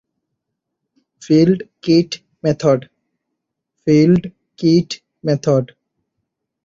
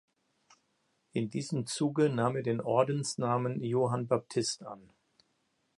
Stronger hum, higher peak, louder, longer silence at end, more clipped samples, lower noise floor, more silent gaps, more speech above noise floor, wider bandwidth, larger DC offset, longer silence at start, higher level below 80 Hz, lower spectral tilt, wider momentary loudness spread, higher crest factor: neither; first, -2 dBFS vs -12 dBFS; first, -16 LUFS vs -32 LUFS; about the same, 1 s vs 1 s; neither; about the same, -77 dBFS vs -76 dBFS; neither; first, 63 dB vs 45 dB; second, 7.6 kHz vs 11.5 kHz; neither; about the same, 1.2 s vs 1.15 s; first, -54 dBFS vs -74 dBFS; first, -7 dB/octave vs -5.5 dB/octave; first, 12 LU vs 8 LU; about the same, 16 dB vs 20 dB